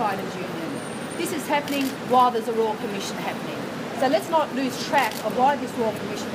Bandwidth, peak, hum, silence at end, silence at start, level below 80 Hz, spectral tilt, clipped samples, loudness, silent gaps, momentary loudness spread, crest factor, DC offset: 15.5 kHz; -6 dBFS; none; 0 s; 0 s; -66 dBFS; -4 dB/octave; under 0.1%; -24 LUFS; none; 9 LU; 18 dB; under 0.1%